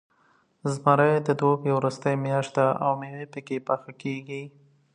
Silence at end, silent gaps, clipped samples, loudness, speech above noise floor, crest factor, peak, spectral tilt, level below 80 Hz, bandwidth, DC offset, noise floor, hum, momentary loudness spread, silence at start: 0.45 s; none; under 0.1%; -25 LUFS; 39 dB; 22 dB; -4 dBFS; -7 dB/octave; -74 dBFS; 11 kHz; under 0.1%; -64 dBFS; none; 16 LU; 0.65 s